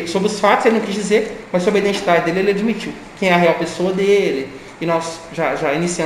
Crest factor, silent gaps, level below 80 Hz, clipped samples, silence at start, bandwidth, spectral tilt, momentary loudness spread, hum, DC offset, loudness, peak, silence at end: 16 dB; none; -50 dBFS; under 0.1%; 0 s; 15 kHz; -5 dB/octave; 9 LU; none; under 0.1%; -17 LUFS; 0 dBFS; 0 s